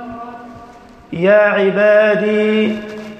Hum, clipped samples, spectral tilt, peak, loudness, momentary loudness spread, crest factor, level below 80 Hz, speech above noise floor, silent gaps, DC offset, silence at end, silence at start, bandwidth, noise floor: none; under 0.1%; -7 dB/octave; -2 dBFS; -13 LUFS; 19 LU; 14 dB; -54 dBFS; 27 dB; none; under 0.1%; 0 s; 0 s; 8.6 kHz; -39 dBFS